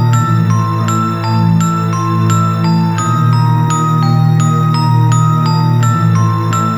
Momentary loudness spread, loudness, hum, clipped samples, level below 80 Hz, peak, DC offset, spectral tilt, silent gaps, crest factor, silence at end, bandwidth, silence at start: 3 LU; -12 LUFS; none; under 0.1%; -44 dBFS; 0 dBFS; 0.5%; -6.5 dB/octave; none; 10 dB; 0 s; 12 kHz; 0 s